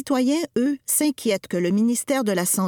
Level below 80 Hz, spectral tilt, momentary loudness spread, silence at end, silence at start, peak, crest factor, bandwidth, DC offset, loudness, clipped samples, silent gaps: -66 dBFS; -4 dB/octave; 3 LU; 0 s; 0 s; -8 dBFS; 14 dB; 19 kHz; under 0.1%; -22 LUFS; under 0.1%; none